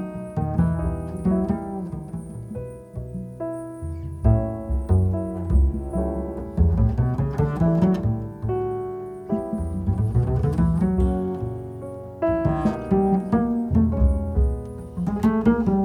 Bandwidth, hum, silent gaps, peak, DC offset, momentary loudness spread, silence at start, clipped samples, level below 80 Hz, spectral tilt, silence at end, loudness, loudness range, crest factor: 10.5 kHz; none; none; -6 dBFS; under 0.1%; 13 LU; 0 s; under 0.1%; -30 dBFS; -10.5 dB/octave; 0 s; -24 LUFS; 5 LU; 16 dB